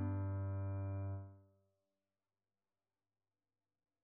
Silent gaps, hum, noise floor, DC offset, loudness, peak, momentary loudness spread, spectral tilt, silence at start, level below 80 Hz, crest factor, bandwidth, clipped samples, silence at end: none; none; under -90 dBFS; under 0.1%; -43 LUFS; -32 dBFS; 8 LU; -9 dB/octave; 0 s; -82 dBFS; 14 dB; 2.5 kHz; under 0.1%; 2.6 s